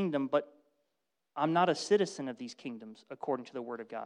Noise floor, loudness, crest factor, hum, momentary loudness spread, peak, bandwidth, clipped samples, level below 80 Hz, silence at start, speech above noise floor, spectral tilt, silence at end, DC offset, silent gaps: -85 dBFS; -33 LUFS; 20 dB; none; 17 LU; -14 dBFS; 11 kHz; under 0.1%; -82 dBFS; 0 s; 52 dB; -5 dB/octave; 0 s; under 0.1%; none